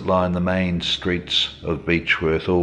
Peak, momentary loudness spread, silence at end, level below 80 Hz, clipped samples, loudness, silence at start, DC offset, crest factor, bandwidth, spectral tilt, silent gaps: -4 dBFS; 3 LU; 0 s; -44 dBFS; under 0.1%; -21 LUFS; 0 s; under 0.1%; 16 dB; 9.4 kHz; -5.5 dB/octave; none